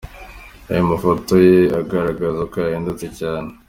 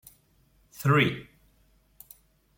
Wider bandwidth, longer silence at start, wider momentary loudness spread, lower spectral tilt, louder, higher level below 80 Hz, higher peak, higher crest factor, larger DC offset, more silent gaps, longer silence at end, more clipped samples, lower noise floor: about the same, 16 kHz vs 17 kHz; second, 0.05 s vs 0.8 s; second, 14 LU vs 27 LU; first, -7.5 dB/octave vs -6 dB/octave; first, -18 LUFS vs -25 LUFS; first, -42 dBFS vs -62 dBFS; first, 0 dBFS vs -8 dBFS; second, 16 dB vs 22 dB; neither; neither; second, 0.15 s vs 1.35 s; neither; second, -38 dBFS vs -64 dBFS